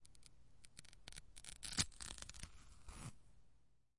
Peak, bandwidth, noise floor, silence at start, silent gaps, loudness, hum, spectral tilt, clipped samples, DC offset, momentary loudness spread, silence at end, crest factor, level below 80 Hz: -18 dBFS; 11.5 kHz; -74 dBFS; 0 s; none; -48 LUFS; none; -1.5 dB/octave; under 0.1%; under 0.1%; 25 LU; 0 s; 34 dB; -62 dBFS